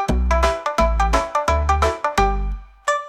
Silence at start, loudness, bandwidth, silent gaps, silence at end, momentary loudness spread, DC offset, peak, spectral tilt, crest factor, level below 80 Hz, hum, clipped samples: 0 s; -20 LUFS; 13.5 kHz; none; 0 s; 6 LU; under 0.1%; -6 dBFS; -5 dB/octave; 14 dB; -24 dBFS; none; under 0.1%